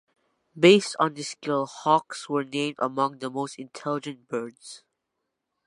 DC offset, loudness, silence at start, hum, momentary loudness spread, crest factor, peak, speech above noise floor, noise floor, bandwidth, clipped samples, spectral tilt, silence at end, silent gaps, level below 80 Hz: under 0.1%; -25 LUFS; 0.55 s; none; 16 LU; 22 dB; -4 dBFS; 56 dB; -82 dBFS; 11.5 kHz; under 0.1%; -4.5 dB/octave; 0.9 s; none; -78 dBFS